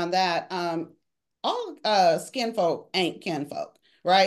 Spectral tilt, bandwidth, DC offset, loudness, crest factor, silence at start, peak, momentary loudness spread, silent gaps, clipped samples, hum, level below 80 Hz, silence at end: -4 dB/octave; 12.5 kHz; under 0.1%; -26 LUFS; 18 dB; 0 s; -8 dBFS; 13 LU; none; under 0.1%; none; -78 dBFS; 0 s